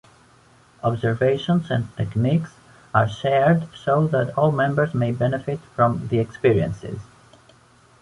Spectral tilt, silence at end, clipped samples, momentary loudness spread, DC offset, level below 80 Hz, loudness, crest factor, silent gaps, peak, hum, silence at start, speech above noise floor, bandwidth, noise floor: -8 dB/octave; 1 s; under 0.1%; 8 LU; under 0.1%; -50 dBFS; -21 LUFS; 20 dB; none; -2 dBFS; none; 0.85 s; 33 dB; 11 kHz; -54 dBFS